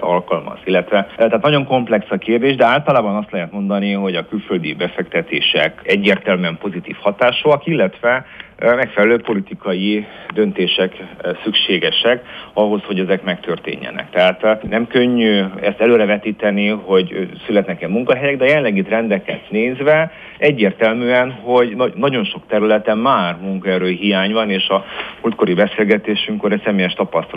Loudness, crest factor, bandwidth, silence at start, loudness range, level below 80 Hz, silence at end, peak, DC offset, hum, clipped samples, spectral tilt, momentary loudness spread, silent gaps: -16 LUFS; 16 dB; 5.4 kHz; 0 s; 2 LU; -54 dBFS; 0 s; 0 dBFS; under 0.1%; none; under 0.1%; -7.5 dB/octave; 8 LU; none